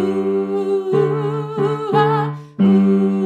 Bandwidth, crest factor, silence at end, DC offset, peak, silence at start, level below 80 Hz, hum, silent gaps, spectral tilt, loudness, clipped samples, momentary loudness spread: 8.6 kHz; 14 dB; 0 s; under 0.1%; -2 dBFS; 0 s; -66 dBFS; none; none; -9 dB/octave; -17 LUFS; under 0.1%; 7 LU